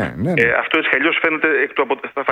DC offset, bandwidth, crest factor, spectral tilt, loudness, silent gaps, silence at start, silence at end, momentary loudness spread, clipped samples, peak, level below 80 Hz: under 0.1%; 10.5 kHz; 18 dB; -6.5 dB/octave; -16 LUFS; none; 0 s; 0 s; 6 LU; under 0.1%; 0 dBFS; -50 dBFS